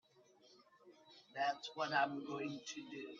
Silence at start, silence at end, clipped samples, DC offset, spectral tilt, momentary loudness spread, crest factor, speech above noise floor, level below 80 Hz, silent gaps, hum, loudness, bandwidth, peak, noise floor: 0.45 s; 0 s; under 0.1%; under 0.1%; -3.5 dB/octave; 17 LU; 22 dB; 27 dB; -90 dBFS; none; none; -41 LUFS; 7.6 kHz; -22 dBFS; -69 dBFS